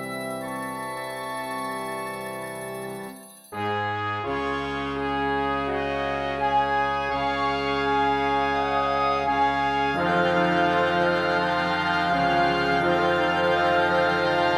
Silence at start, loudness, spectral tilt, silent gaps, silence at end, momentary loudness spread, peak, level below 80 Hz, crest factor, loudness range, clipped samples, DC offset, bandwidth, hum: 0 s; -24 LUFS; -5 dB/octave; none; 0 s; 10 LU; -10 dBFS; -48 dBFS; 14 dB; 9 LU; under 0.1%; under 0.1%; 15.5 kHz; none